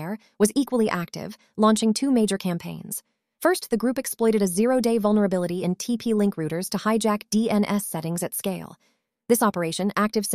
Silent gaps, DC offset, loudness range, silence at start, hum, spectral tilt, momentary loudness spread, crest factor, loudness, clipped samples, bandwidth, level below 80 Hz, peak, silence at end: none; under 0.1%; 2 LU; 0 s; none; -5 dB/octave; 11 LU; 16 dB; -24 LUFS; under 0.1%; 15.5 kHz; -62 dBFS; -8 dBFS; 0 s